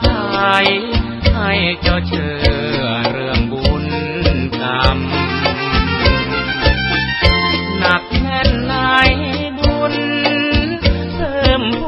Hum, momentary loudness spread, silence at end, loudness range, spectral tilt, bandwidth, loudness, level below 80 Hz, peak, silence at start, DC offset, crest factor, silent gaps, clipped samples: none; 5 LU; 0 s; 2 LU; -7 dB/octave; 8.6 kHz; -15 LUFS; -22 dBFS; 0 dBFS; 0 s; under 0.1%; 16 dB; none; under 0.1%